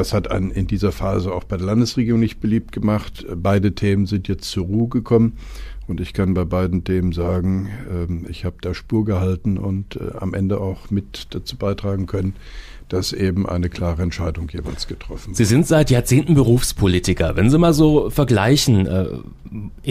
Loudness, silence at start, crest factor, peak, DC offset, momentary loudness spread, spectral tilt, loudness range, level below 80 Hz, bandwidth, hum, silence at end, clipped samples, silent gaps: -19 LUFS; 0 s; 16 dB; -4 dBFS; under 0.1%; 14 LU; -6.5 dB/octave; 8 LU; -32 dBFS; 15.5 kHz; none; 0 s; under 0.1%; none